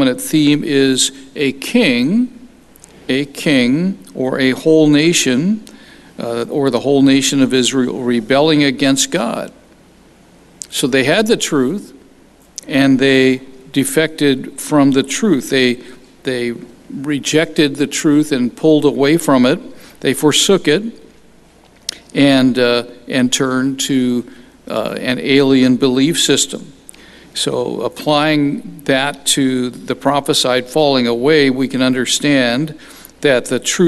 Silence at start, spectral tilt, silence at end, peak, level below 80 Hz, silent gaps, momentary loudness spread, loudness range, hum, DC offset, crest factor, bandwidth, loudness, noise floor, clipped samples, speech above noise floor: 0 s; -4 dB/octave; 0 s; 0 dBFS; -52 dBFS; none; 11 LU; 3 LU; none; under 0.1%; 14 dB; 13 kHz; -14 LUFS; -46 dBFS; under 0.1%; 32 dB